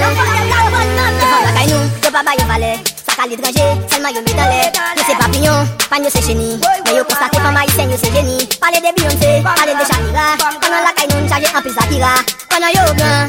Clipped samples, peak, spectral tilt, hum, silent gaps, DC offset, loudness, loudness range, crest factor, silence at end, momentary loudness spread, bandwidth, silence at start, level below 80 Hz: under 0.1%; 0 dBFS; -3.5 dB/octave; none; none; under 0.1%; -12 LUFS; 1 LU; 12 dB; 0 s; 4 LU; 17 kHz; 0 s; -30 dBFS